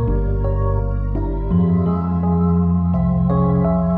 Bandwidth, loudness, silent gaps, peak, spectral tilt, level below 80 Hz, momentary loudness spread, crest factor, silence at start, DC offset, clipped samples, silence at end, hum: 2.1 kHz; -18 LUFS; none; -6 dBFS; -13.5 dB/octave; -24 dBFS; 6 LU; 10 dB; 0 s; under 0.1%; under 0.1%; 0 s; none